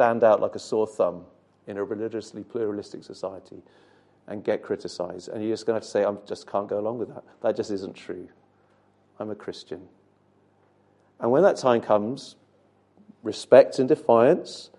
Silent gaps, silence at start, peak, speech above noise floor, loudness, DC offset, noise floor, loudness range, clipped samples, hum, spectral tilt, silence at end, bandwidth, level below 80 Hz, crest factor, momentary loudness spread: none; 0 s; -2 dBFS; 38 dB; -24 LUFS; under 0.1%; -63 dBFS; 12 LU; under 0.1%; 50 Hz at -65 dBFS; -6 dB/octave; 0.1 s; 11 kHz; -68 dBFS; 24 dB; 19 LU